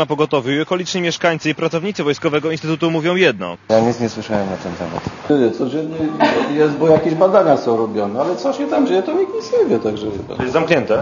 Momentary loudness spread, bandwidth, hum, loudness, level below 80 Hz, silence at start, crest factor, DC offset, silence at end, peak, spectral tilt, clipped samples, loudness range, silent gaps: 9 LU; 7.4 kHz; none; -17 LUFS; -52 dBFS; 0 s; 16 dB; under 0.1%; 0 s; 0 dBFS; -6 dB/octave; under 0.1%; 3 LU; none